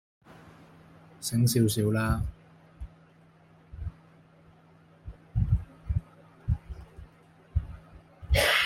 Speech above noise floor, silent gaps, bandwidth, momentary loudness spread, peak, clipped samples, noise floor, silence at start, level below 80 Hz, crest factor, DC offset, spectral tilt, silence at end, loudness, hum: 32 dB; none; 16.5 kHz; 26 LU; -10 dBFS; under 0.1%; -58 dBFS; 0.45 s; -40 dBFS; 20 dB; under 0.1%; -5 dB/octave; 0 s; -30 LUFS; none